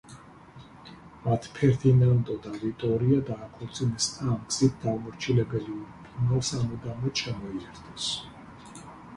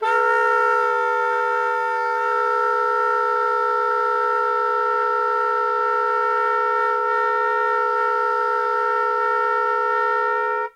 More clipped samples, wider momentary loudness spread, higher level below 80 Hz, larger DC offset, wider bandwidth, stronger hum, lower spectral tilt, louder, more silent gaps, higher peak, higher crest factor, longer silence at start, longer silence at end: neither; first, 22 LU vs 2 LU; first, -52 dBFS vs -78 dBFS; neither; about the same, 11 kHz vs 11.5 kHz; neither; first, -5.5 dB/octave vs -1 dB/octave; second, -28 LUFS vs -20 LUFS; neither; about the same, -10 dBFS vs -8 dBFS; first, 18 dB vs 12 dB; about the same, 0.1 s vs 0 s; about the same, 0 s vs 0.05 s